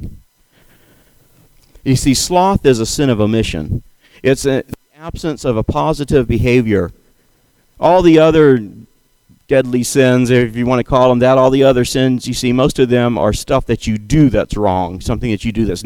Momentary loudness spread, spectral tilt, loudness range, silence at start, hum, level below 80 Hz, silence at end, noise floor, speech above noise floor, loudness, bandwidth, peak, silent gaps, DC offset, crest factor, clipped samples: 10 LU; -6 dB/octave; 5 LU; 0 s; none; -32 dBFS; 0 s; -55 dBFS; 42 dB; -13 LUFS; 17.5 kHz; 0 dBFS; none; under 0.1%; 14 dB; under 0.1%